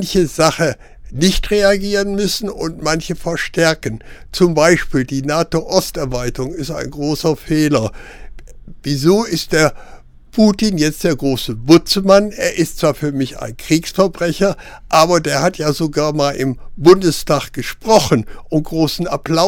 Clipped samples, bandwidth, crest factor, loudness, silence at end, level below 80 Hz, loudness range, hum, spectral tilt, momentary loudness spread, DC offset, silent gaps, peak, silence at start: under 0.1%; 18.5 kHz; 16 dB; -16 LUFS; 0 s; -34 dBFS; 4 LU; none; -5 dB/octave; 11 LU; under 0.1%; none; 0 dBFS; 0 s